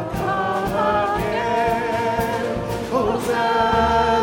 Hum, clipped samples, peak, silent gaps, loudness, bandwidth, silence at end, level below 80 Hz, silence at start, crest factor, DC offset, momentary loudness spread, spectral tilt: none; under 0.1%; -4 dBFS; none; -20 LUFS; 17 kHz; 0 s; -40 dBFS; 0 s; 16 dB; under 0.1%; 6 LU; -5.5 dB/octave